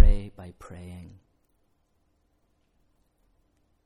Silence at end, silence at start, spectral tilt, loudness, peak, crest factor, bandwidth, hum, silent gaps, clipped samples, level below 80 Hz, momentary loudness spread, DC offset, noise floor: 3.6 s; 0 s; -8 dB/octave; -31 LUFS; -4 dBFS; 22 dB; 4.2 kHz; none; none; under 0.1%; -30 dBFS; 17 LU; under 0.1%; -70 dBFS